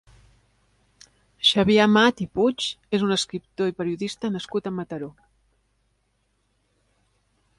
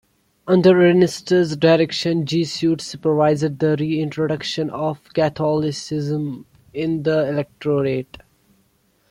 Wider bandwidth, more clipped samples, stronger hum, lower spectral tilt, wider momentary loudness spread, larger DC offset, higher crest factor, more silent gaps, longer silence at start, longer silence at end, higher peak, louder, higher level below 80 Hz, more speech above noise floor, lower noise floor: about the same, 11.5 kHz vs 12 kHz; neither; first, 50 Hz at -50 dBFS vs none; second, -4.5 dB/octave vs -6.5 dB/octave; first, 14 LU vs 11 LU; neither; about the same, 22 dB vs 18 dB; neither; first, 1.4 s vs 0.45 s; first, 2.5 s vs 1.05 s; about the same, -4 dBFS vs -2 dBFS; second, -22 LUFS vs -19 LUFS; about the same, -58 dBFS vs -56 dBFS; first, 47 dB vs 43 dB; first, -70 dBFS vs -62 dBFS